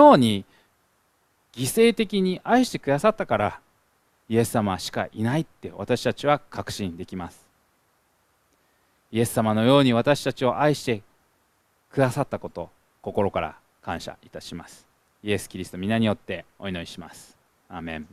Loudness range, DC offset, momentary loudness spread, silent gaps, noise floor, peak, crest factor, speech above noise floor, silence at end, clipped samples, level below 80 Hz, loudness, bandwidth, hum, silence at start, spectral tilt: 7 LU; under 0.1%; 18 LU; none; -67 dBFS; -2 dBFS; 22 dB; 44 dB; 0.1 s; under 0.1%; -56 dBFS; -24 LUFS; 15.5 kHz; none; 0 s; -5.5 dB/octave